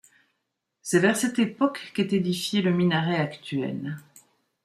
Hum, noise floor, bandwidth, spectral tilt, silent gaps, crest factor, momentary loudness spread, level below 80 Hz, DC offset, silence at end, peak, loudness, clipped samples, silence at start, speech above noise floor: none; -80 dBFS; 15 kHz; -5 dB/octave; none; 18 dB; 11 LU; -68 dBFS; under 0.1%; 0.65 s; -8 dBFS; -25 LUFS; under 0.1%; 0.85 s; 55 dB